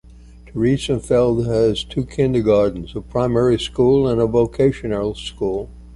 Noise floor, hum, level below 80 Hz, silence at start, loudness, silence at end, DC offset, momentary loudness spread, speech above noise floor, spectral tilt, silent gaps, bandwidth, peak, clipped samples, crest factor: -42 dBFS; none; -38 dBFS; 0.35 s; -18 LUFS; 0 s; under 0.1%; 9 LU; 24 dB; -7 dB/octave; none; 11.5 kHz; -4 dBFS; under 0.1%; 14 dB